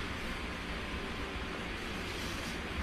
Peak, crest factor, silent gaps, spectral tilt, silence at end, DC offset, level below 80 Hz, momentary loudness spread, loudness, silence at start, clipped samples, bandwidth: -24 dBFS; 14 dB; none; -4 dB/octave; 0 s; under 0.1%; -46 dBFS; 1 LU; -39 LUFS; 0 s; under 0.1%; 14 kHz